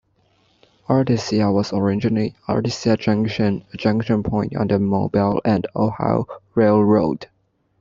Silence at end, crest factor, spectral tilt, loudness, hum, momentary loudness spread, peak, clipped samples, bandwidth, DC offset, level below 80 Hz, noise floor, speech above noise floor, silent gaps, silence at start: 0.55 s; 16 dB; -7.5 dB/octave; -20 LUFS; none; 6 LU; -2 dBFS; under 0.1%; 7.6 kHz; under 0.1%; -50 dBFS; -61 dBFS; 42 dB; none; 0.9 s